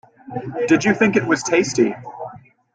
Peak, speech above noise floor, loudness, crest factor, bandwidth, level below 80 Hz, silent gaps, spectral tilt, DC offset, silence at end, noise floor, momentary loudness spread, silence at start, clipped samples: -2 dBFS; 21 dB; -18 LUFS; 18 dB; 9.4 kHz; -58 dBFS; none; -5 dB/octave; under 0.1%; 0.35 s; -39 dBFS; 17 LU; 0.25 s; under 0.1%